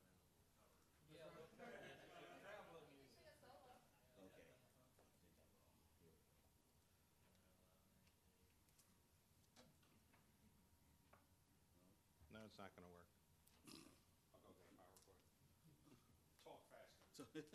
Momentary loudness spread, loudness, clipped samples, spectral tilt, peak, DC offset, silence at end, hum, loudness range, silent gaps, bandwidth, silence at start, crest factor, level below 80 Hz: 8 LU; -64 LUFS; under 0.1%; -4 dB/octave; -42 dBFS; under 0.1%; 0 s; none; 6 LU; none; 13 kHz; 0 s; 26 dB; -86 dBFS